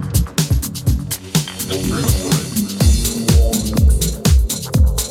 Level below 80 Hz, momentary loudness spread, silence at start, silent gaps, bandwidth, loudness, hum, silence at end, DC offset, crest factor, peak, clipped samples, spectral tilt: -18 dBFS; 5 LU; 0 s; none; 16.5 kHz; -17 LUFS; none; 0 s; under 0.1%; 14 dB; -2 dBFS; under 0.1%; -5 dB/octave